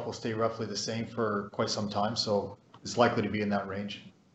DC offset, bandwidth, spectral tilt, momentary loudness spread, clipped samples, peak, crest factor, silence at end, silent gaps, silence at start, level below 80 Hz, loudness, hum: under 0.1%; 8.4 kHz; -4.5 dB/octave; 11 LU; under 0.1%; -10 dBFS; 22 dB; 0.25 s; none; 0 s; -68 dBFS; -31 LUFS; none